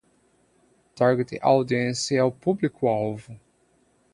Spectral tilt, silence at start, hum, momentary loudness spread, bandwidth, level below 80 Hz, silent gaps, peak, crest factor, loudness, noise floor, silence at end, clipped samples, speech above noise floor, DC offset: -5.5 dB/octave; 0.95 s; none; 5 LU; 11.5 kHz; -64 dBFS; none; -6 dBFS; 20 dB; -24 LUFS; -64 dBFS; 0.8 s; under 0.1%; 41 dB; under 0.1%